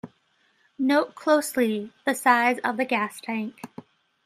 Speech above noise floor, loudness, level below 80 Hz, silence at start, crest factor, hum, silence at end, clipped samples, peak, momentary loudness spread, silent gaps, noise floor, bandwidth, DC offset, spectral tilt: 42 dB; -24 LUFS; -76 dBFS; 0.05 s; 20 dB; none; 0.45 s; under 0.1%; -4 dBFS; 11 LU; none; -66 dBFS; 15.5 kHz; under 0.1%; -4 dB/octave